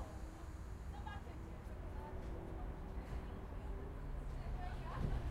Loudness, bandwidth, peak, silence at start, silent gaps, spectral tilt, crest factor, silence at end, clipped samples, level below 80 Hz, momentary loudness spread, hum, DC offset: -49 LUFS; 14.5 kHz; -28 dBFS; 0 s; none; -7 dB/octave; 18 dB; 0 s; under 0.1%; -48 dBFS; 6 LU; none; under 0.1%